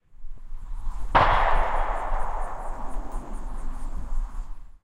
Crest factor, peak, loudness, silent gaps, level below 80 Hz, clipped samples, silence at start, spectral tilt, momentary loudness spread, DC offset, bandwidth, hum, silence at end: 22 dB; -4 dBFS; -28 LUFS; none; -28 dBFS; under 0.1%; 0.1 s; -5.5 dB/octave; 21 LU; under 0.1%; 9.6 kHz; none; 0.15 s